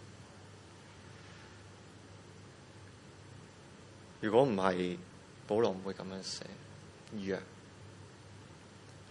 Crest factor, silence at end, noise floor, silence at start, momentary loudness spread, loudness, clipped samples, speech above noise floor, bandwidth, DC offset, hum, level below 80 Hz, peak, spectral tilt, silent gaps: 26 dB; 0 s; -55 dBFS; 0 s; 23 LU; -35 LUFS; under 0.1%; 21 dB; 11 kHz; under 0.1%; none; -72 dBFS; -14 dBFS; -5.5 dB/octave; none